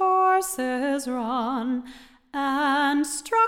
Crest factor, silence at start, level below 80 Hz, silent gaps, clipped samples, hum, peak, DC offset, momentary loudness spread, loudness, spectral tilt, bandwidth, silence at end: 14 dB; 0 s; -60 dBFS; none; under 0.1%; none; -10 dBFS; under 0.1%; 9 LU; -24 LUFS; -2.5 dB/octave; 17 kHz; 0 s